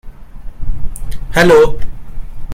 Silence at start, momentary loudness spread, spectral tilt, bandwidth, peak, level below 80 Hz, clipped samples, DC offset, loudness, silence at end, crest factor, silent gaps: 0.05 s; 26 LU; -5.5 dB/octave; 15 kHz; 0 dBFS; -22 dBFS; under 0.1%; under 0.1%; -10 LUFS; 0 s; 12 dB; none